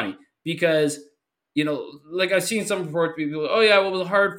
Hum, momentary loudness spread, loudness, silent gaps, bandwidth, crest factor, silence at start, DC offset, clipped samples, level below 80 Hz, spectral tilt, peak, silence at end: none; 14 LU; -22 LUFS; none; 16.5 kHz; 18 dB; 0 s; under 0.1%; under 0.1%; -72 dBFS; -4 dB/octave; -6 dBFS; 0 s